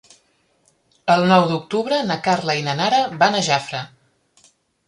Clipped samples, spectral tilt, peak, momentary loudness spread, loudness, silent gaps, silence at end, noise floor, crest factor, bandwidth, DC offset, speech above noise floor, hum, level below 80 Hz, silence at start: under 0.1%; -4.5 dB/octave; -2 dBFS; 12 LU; -19 LUFS; none; 1 s; -62 dBFS; 18 dB; 11.5 kHz; under 0.1%; 44 dB; none; -62 dBFS; 1.05 s